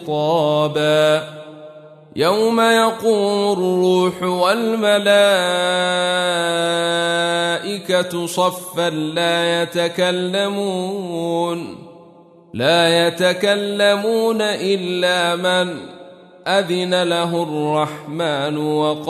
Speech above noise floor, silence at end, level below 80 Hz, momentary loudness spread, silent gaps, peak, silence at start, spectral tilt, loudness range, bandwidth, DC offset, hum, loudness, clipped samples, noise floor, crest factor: 28 dB; 0 s; -66 dBFS; 8 LU; none; -4 dBFS; 0 s; -4 dB/octave; 4 LU; 13.5 kHz; under 0.1%; none; -17 LUFS; under 0.1%; -46 dBFS; 14 dB